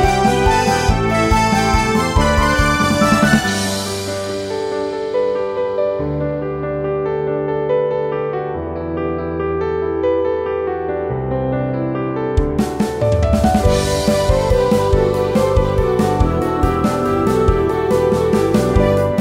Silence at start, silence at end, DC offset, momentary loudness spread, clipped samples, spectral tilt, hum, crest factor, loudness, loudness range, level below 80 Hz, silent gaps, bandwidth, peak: 0 s; 0 s; under 0.1%; 7 LU; under 0.1%; -5.5 dB/octave; none; 16 dB; -17 LUFS; 6 LU; -26 dBFS; none; 16 kHz; 0 dBFS